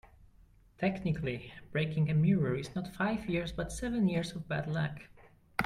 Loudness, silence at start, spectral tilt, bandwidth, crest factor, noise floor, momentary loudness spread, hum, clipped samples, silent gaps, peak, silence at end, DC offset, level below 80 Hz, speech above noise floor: -33 LUFS; 0.2 s; -7 dB/octave; 14 kHz; 20 dB; -61 dBFS; 9 LU; none; under 0.1%; none; -14 dBFS; 0 s; under 0.1%; -54 dBFS; 29 dB